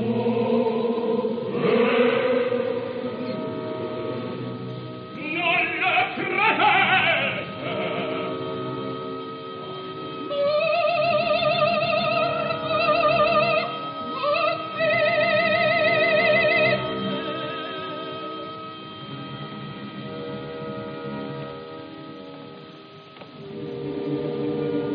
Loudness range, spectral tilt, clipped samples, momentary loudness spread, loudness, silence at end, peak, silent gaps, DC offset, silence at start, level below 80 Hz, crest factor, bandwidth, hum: 14 LU; -2.5 dB/octave; under 0.1%; 17 LU; -23 LUFS; 0 s; -6 dBFS; none; under 0.1%; 0 s; -62 dBFS; 18 dB; 5.2 kHz; none